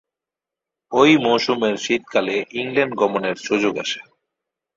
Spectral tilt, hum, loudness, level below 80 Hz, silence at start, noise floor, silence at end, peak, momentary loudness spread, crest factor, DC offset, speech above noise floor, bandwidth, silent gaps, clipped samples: -4.5 dB/octave; none; -19 LUFS; -64 dBFS; 0.9 s; -87 dBFS; 0.75 s; -2 dBFS; 10 LU; 18 dB; under 0.1%; 68 dB; 7.8 kHz; none; under 0.1%